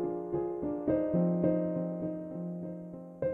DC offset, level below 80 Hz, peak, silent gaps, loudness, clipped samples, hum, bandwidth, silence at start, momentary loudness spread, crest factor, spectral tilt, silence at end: under 0.1%; -62 dBFS; -16 dBFS; none; -33 LUFS; under 0.1%; none; 2.8 kHz; 0 s; 12 LU; 16 dB; -12.5 dB/octave; 0 s